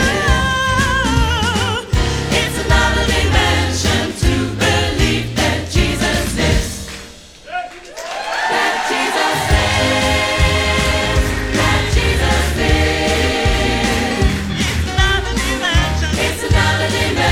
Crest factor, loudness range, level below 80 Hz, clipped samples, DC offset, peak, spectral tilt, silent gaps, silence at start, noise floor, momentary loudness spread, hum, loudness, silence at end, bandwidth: 14 dB; 4 LU; -22 dBFS; under 0.1%; under 0.1%; 0 dBFS; -4 dB/octave; none; 0 s; -36 dBFS; 4 LU; none; -15 LUFS; 0 s; 16.5 kHz